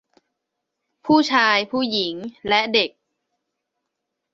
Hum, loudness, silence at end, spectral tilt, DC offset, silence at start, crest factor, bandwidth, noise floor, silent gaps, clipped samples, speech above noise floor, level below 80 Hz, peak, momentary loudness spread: none; -19 LUFS; 1.45 s; -3.5 dB/octave; under 0.1%; 1.05 s; 20 dB; 7.8 kHz; -80 dBFS; none; under 0.1%; 61 dB; -64 dBFS; -2 dBFS; 10 LU